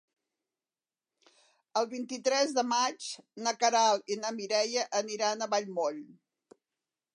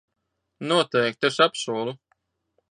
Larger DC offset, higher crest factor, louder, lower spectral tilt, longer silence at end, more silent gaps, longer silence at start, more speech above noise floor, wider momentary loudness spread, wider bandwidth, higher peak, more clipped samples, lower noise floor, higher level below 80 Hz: neither; about the same, 18 dB vs 20 dB; second, -30 LUFS vs -23 LUFS; second, -1.5 dB/octave vs -4 dB/octave; first, 1.05 s vs 0.75 s; neither; first, 1.75 s vs 0.6 s; first, over 60 dB vs 50 dB; second, 9 LU vs 14 LU; about the same, 11.5 kHz vs 10.5 kHz; second, -14 dBFS vs -6 dBFS; neither; first, under -90 dBFS vs -73 dBFS; second, under -90 dBFS vs -74 dBFS